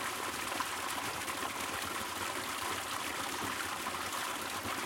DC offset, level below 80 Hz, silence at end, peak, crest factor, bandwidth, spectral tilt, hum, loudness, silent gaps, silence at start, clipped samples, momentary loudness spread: under 0.1%; -66 dBFS; 0 s; -18 dBFS; 18 dB; 17 kHz; -1.5 dB/octave; none; -36 LUFS; none; 0 s; under 0.1%; 1 LU